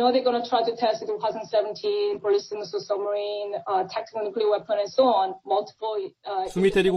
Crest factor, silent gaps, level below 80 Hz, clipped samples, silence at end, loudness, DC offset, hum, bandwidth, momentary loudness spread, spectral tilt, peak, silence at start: 16 dB; none; -56 dBFS; under 0.1%; 0 s; -25 LUFS; under 0.1%; none; 11 kHz; 9 LU; -5.5 dB/octave; -8 dBFS; 0 s